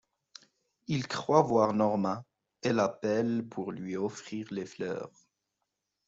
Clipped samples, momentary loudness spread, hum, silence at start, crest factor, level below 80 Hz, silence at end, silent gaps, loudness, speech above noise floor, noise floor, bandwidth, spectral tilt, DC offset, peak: under 0.1%; 14 LU; none; 0.9 s; 24 dB; -72 dBFS; 1 s; none; -31 LUFS; 54 dB; -84 dBFS; 8 kHz; -6 dB/octave; under 0.1%; -8 dBFS